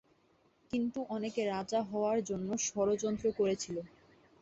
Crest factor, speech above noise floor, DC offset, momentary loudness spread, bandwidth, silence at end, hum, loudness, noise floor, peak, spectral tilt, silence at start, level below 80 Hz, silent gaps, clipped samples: 14 dB; 36 dB; under 0.1%; 7 LU; 8.2 kHz; 0.55 s; none; -35 LUFS; -70 dBFS; -20 dBFS; -4.5 dB/octave; 0.75 s; -68 dBFS; none; under 0.1%